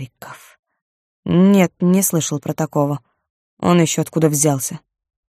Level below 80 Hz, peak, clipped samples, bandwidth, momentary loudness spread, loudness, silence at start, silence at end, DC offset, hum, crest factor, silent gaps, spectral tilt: -58 dBFS; -2 dBFS; under 0.1%; 15.5 kHz; 19 LU; -17 LUFS; 0 s; 0.5 s; under 0.1%; none; 16 dB; 0.59-0.63 s, 0.82-1.23 s, 3.30-3.57 s; -5.5 dB/octave